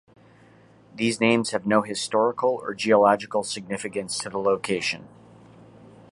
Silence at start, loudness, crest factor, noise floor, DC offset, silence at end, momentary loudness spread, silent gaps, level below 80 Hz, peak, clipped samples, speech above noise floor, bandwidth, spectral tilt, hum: 0.95 s; -24 LUFS; 20 dB; -53 dBFS; under 0.1%; 1.05 s; 11 LU; none; -66 dBFS; -4 dBFS; under 0.1%; 30 dB; 11.5 kHz; -4 dB/octave; none